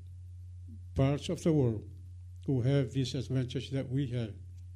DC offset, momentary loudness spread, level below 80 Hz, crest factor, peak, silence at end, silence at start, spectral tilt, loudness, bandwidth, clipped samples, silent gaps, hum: under 0.1%; 19 LU; -54 dBFS; 16 dB; -18 dBFS; 0 s; 0 s; -7.5 dB/octave; -33 LUFS; 11.5 kHz; under 0.1%; none; none